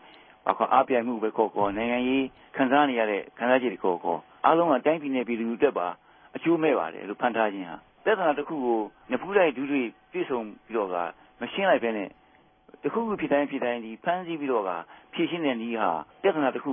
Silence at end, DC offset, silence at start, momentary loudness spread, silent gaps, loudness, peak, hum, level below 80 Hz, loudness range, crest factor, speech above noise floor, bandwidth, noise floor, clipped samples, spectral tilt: 0 s; under 0.1%; 0.45 s; 11 LU; none; -27 LUFS; -6 dBFS; none; -66 dBFS; 4 LU; 22 dB; 32 dB; 3.8 kHz; -58 dBFS; under 0.1%; -9.5 dB/octave